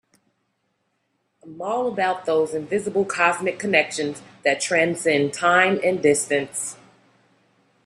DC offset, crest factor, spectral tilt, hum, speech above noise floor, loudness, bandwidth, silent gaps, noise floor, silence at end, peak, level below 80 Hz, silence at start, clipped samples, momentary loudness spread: under 0.1%; 20 dB; -3.5 dB/octave; none; 51 dB; -21 LUFS; 14.5 kHz; none; -72 dBFS; 1.1 s; -2 dBFS; -68 dBFS; 1.45 s; under 0.1%; 10 LU